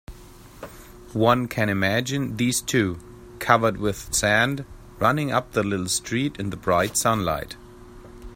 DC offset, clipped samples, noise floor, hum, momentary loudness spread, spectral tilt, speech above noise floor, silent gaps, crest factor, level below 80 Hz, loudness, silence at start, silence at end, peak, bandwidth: under 0.1%; under 0.1%; -45 dBFS; none; 18 LU; -4 dB/octave; 23 dB; none; 24 dB; -46 dBFS; -23 LUFS; 0.1 s; 0 s; 0 dBFS; 16.5 kHz